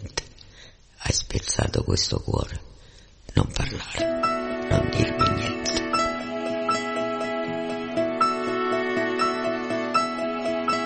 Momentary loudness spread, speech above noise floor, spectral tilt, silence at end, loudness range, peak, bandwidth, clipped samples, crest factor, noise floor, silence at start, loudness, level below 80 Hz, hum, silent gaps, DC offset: 6 LU; 25 dB; -4.5 dB/octave; 0 s; 2 LU; -4 dBFS; 8.8 kHz; under 0.1%; 22 dB; -49 dBFS; 0 s; -25 LUFS; -40 dBFS; none; none; under 0.1%